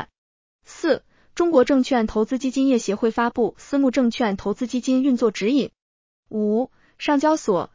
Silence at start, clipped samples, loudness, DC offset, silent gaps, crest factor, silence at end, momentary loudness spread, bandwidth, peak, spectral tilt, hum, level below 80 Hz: 0 s; under 0.1%; -21 LUFS; under 0.1%; 0.18-0.59 s, 5.82-6.23 s; 18 dB; 0.1 s; 8 LU; 7.6 kHz; -4 dBFS; -5 dB/octave; none; -54 dBFS